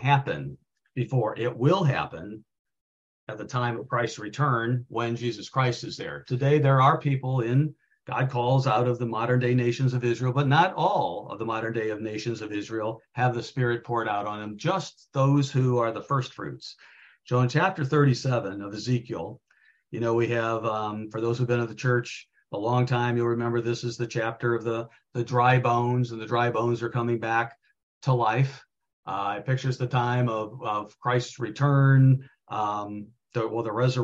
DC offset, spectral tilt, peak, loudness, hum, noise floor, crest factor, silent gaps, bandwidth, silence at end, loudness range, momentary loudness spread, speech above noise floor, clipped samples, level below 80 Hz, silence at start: under 0.1%; -7 dB/octave; -8 dBFS; -26 LUFS; none; -58 dBFS; 18 dB; 2.59-2.65 s, 2.81-3.27 s, 27.83-28.01 s, 28.93-29.03 s; 7.6 kHz; 0 s; 5 LU; 12 LU; 32 dB; under 0.1%; -64 dBFS; 0 s